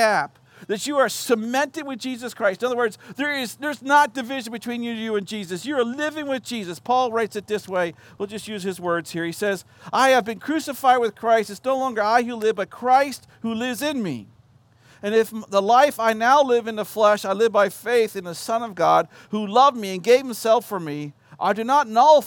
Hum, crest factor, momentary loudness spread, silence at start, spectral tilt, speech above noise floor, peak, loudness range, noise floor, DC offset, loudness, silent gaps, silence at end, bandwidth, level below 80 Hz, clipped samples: none; 18 dB; 13 LU; 0 s; -4 dB/octave; 34 dB; -4 dBFS; 6 LU; -55 dBFS; under 0.1%; -22 LUFS; none; 0 s; 17 kHz; -72 dBFS; under 0.1%